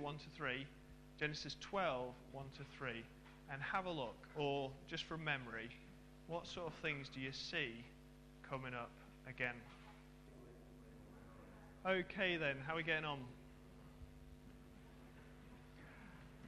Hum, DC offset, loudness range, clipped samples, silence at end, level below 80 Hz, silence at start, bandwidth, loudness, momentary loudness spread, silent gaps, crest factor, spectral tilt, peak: none; under 0.1%; 7 LU; under 0.1%; 0 s; -66 dBFS; 0 s; 13.5 kHz; -45 LUFS; 20 LU; none; 24 dB; -5 dB/octave; -24 dBFS